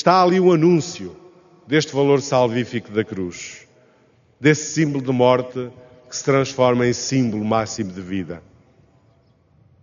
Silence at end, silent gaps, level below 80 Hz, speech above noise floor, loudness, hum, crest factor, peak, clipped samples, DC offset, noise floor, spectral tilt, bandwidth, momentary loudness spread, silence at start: 1.45 s; none; -60 dBFS; 38 dB; -19 LUFS; none; 20 dB; 0 dBFS; under 0.1%; under 0.1%; -57 dBFS; -5.5 dB/octave; 7.4 kHz; 16 LU; 0 s